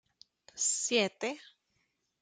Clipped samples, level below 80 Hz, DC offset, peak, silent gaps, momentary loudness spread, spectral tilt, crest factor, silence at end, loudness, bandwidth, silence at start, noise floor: under 0.1%; -84 dBFS; under 0.1%; -14 dBFS; none; 18 LU; -1 dB/octave; 22 dB; 0.8 s; -31 LUFS; 10 kHz; 0.55 s; -79 dBFS